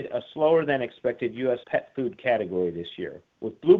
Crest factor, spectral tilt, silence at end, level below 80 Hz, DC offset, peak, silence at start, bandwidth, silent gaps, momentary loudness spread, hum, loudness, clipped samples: 20 dB; -8.5 dB/octave; 0 s; -66 dBFS; under 0.1%; -6 dBFS; 0 s; 4.2 kHz; none; 14 LU; none; -27 LUFS; under 0.1%